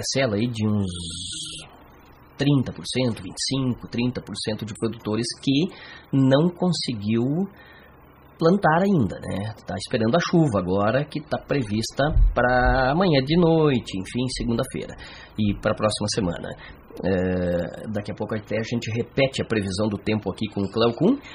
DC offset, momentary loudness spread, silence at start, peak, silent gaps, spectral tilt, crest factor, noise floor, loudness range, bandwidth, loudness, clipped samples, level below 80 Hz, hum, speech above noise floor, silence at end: under 0.1%; 11 LU; 0 s; -6 dBFS; none; -5.5 dB/octave; 18 dB; -50 dBFS; 5 LU; 13 kHz; -24 LUFS; under 0.1%; -36 dBFS; none; 27 dB; 0 s